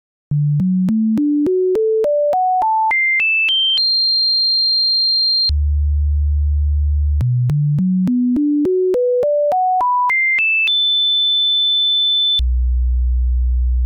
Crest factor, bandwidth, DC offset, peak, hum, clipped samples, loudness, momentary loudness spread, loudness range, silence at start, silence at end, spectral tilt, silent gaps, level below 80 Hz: 4 dB; 5.2 kHz; under 0.1%; -12 dBFS; none; under 0.1%; -14 LUFS; 6 LU; 4 LU; 0.3 s; 0 s; -7 dB/octave; none; -22 dBFS